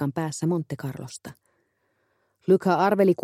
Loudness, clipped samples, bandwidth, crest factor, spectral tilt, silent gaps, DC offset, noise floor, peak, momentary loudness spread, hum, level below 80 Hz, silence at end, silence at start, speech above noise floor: -24 LUFS; under 0.1%; 15 kHz; 18 dB; -6.5 dB/octave; none; under 0.1%; -71 dBFS; -8 dBFS; 19 LU; none; -68 dBFS; 0 s; 0 s; 48 dB